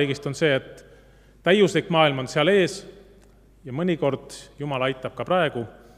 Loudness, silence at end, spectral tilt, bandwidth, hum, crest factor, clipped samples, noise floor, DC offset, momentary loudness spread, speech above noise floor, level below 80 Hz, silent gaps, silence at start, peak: -23 LUFS; 0.25 s; -5.5 dB/octave; 13.5 kHz; none; 20 dB; under 0.1%; -53 dBFS; under 0.1%; 15 LU; 30 dB; -56 dBFS; none; 0 s; -4 dBFS